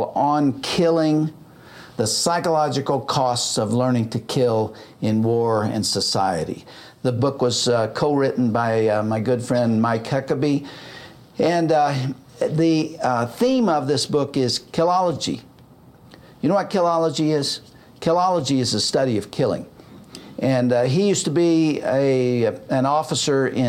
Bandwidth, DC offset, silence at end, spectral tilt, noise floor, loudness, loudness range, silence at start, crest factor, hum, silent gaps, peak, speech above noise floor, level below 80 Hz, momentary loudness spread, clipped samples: 16 kHz; under 0.1%; 0 s; -5 dB/octave; -48 dBFS; -20 LUFS; 2 LU; 0 s; 14 dB; none; none; -6 dBFS; 28 dB; -58 dBFS; 8 LU; under 0.1%